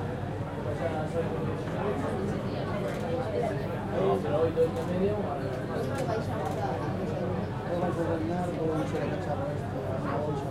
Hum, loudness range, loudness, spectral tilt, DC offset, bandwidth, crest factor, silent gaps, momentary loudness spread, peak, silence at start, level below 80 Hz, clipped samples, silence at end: none; 2 LU; -31 LUFS; -7.5 dB/octave; under 0.1%; 15.5 kHz; 14 dB; none; 5 LU; -16 dBFS; 0 s; -50 dBFS; under 0.1%; 0 s